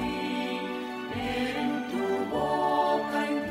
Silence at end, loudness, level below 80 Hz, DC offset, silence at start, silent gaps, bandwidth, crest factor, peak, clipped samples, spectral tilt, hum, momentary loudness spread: 0 s; -29 LUFS; -56 dBFS; under 0.1%; 0 s; none; 16 kHz; 16 dB; -14 dBFS; under 0.1%; -5 dB/octave; none; 7 LU